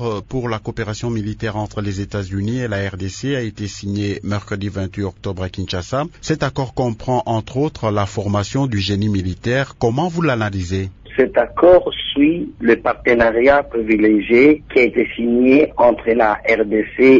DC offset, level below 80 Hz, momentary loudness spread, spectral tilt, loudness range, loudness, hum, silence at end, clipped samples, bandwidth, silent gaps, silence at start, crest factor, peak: under 0.1%; -42 dBFS; 12 LU; -6.5 dB/octave; 9 LU; -17 LUFS; none; 0 s; under 0.1%; 7.8 kHz; none; 0 s; 16 dB; -2 dBFS